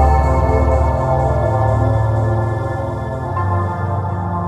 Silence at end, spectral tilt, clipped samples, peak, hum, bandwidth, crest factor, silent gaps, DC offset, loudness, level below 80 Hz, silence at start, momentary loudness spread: 0 s; -9 dB/octave; under 0.1%; -2 dBFS; none; 8.6 kHz; 14 dB; none; 0.2%; -17 LUFS; -22 dBFS; 0 s; 7 LU